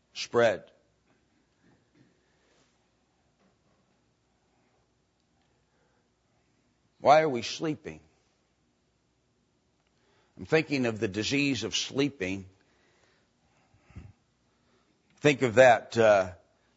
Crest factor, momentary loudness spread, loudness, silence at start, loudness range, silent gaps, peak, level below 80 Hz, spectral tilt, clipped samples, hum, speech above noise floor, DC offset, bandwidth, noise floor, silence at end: 24 dB; 16 LU; -26 LUFS; 0.15 s; 11 LU; none; -6 dBFS; -68 dBFS; -4.5 dB/octave; under 0.1%; none; 47 dB; under 0.1%; 8 kHz; -72 dBFS; 0.4 s